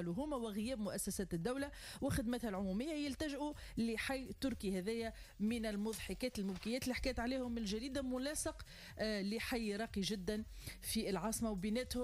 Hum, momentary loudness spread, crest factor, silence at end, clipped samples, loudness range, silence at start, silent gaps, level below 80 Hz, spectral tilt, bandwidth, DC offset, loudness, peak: none; 5 LU; 14 dB; 0 s; under 0.1%; 1 LU; 0 s; none; -56 dBFS; -4.5 dB/octave; 15.5 kHz; under 0.1%; -41 LUFS; -28 dBFS